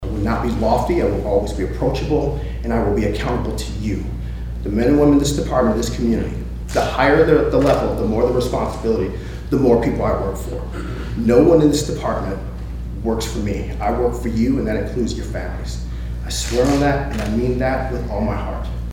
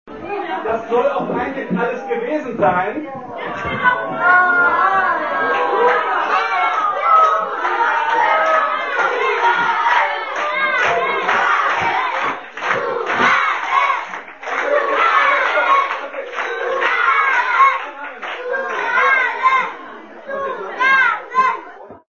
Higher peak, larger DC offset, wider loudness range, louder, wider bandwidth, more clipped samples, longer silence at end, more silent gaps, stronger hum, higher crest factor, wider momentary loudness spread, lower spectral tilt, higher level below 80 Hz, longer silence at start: about the same, 0 dBFS vs 0 dBFS; second, under 0.1% vs 0.3%; about the same, 5 LU vs 3 LU; second, -19 LUFS vs -16 LUFS; first, 16.5 kHz vs 7.2 kHz; neither; about the same, 0 s vs 0.1 s; neither; neither; about the same, 18 dB vs 16 dB; about the same, 13 LU vs 12 LU; first, -6.5 dB/octave vs -4 dB/octave; first, -26 dBFS vs -58 dBFS; about the same, 0 s vs 0.05 s